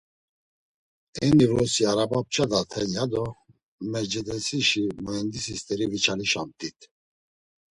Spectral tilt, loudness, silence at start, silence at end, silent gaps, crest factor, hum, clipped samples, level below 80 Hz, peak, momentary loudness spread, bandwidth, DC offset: -4 dB/octave; -25 LUFS; 1.15 s; 0.9 s; 3.63-3.79 s; 20 dB; none; under 0.1%; -54 dBFS; -8 dBFS; 12 LU; 11.5 kHz; under 0.1%